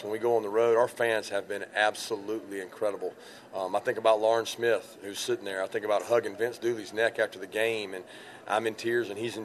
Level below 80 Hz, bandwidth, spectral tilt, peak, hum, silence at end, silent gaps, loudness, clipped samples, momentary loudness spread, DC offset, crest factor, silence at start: -80 dBFS; 13.5 kHz; -3.5 dB/octave; -10 dBFS; none; 0 s; none; -29 LUFS; under 0.1%; 13 LU; under 0.1%; 20 dB; 0 s